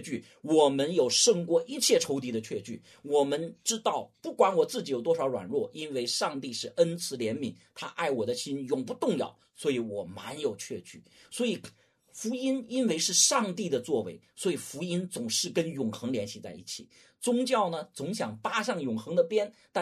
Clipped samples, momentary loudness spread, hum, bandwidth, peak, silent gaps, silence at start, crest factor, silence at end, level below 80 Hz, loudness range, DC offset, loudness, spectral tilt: under 0.1%; 14 LU; none; 13.5 kHz; -10 dBFS; none; 0 s; 20 dB; 0 s; -76 dBFS; 6 LU; under 0.1%; -29 LUFS; -3 dB/octave